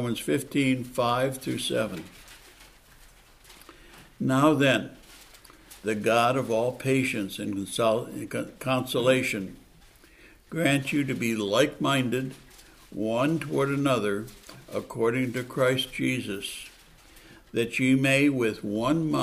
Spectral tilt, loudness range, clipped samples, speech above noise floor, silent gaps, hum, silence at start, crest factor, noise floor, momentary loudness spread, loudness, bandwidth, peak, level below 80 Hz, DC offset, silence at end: -5 dB/octave; 3 LU; under 0.1%; 29 dB; none; none; 0 s; 20 dB; -55 dBFS; 13 LU; -26 LUFS; 15.5 kHz; -8 dBFS; -58 dBFS; under 0.1%; 0 s